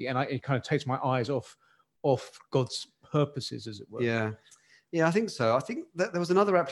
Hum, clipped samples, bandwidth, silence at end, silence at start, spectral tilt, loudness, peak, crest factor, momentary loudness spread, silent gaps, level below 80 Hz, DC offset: none; under 0.1%; 12 kHz; 0 s; 0 s; -6 dB/octave; -29 LUFS; -10 dBFS; 20 dB; 11 LU; none; -70 dBFS; under 0.1%